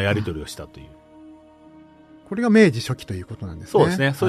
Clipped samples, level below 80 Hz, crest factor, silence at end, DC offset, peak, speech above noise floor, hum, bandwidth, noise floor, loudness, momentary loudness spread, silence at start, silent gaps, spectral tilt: under 0.1%; -48 dBFS; 18 dB; 0 s; under 0.1%; -4 dBFS; 27 dB; none; 13.5 kHz; -48 dBFS; -20 LUFS; 19 LU; 0 s; none; -6.5 dB/octave